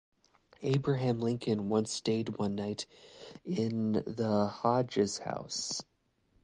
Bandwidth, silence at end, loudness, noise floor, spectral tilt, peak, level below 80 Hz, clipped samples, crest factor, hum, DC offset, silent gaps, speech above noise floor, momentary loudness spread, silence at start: 10.5 kHz; 0.6 s; -33 LUFS; -72 dBFS; -5.5 dB/octave; -14 dBFS; -66 dBFS; under 0.1%; 20 dB; none; under 0.1%; none; 40 dB; 10 LU; 0.6 s